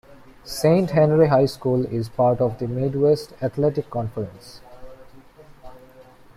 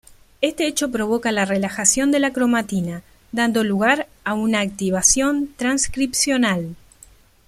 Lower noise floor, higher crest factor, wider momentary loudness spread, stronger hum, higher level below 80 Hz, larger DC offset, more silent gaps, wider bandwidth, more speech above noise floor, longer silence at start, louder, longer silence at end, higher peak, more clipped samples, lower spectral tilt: about the same, -47 dBFS vs -50 dBFS; about the same, 18 dB vs 20 dB; first, 12 LU vs 9 LU; neither; about the same, -50 dBFS vs -46 dBFS; neither; neither; about the same, 15.5 kHz vs 15.5 kHz; about the same, 27 dB vs 30 dB; about the same, 0.1 s vs 0.1 s; about the same, -21 LUFS vs -19 LUFS; second, 0.35 s vs 0.7 s; about the same, -4 dBFS vs -2 dBFS; neither; first, -7.5 dB/octave vs -3 dB/octave